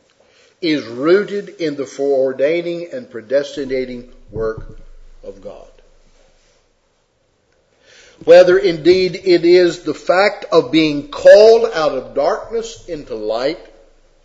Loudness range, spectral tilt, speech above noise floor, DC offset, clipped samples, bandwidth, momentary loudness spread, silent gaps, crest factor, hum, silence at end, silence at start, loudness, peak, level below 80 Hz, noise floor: 16 LU; -5 dB/octave; 47 dB; under 0.1%; 0.2%; 8 kHz; 20 LU; none; 16 dB; none; 0.65 s; 0.6 s; -14 LUFS; 0 dBFS; -44 dBFS; -61 dBFS